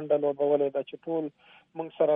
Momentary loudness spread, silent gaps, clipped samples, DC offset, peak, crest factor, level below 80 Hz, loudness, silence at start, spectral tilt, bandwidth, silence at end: 14 LU; none; under 0.1%; under 0.1%; -12 dBFS; 16 dB; -82 dBFS; -29 LUFS; 0 s; -10 dB/octave; 3.8 kHz; 0 s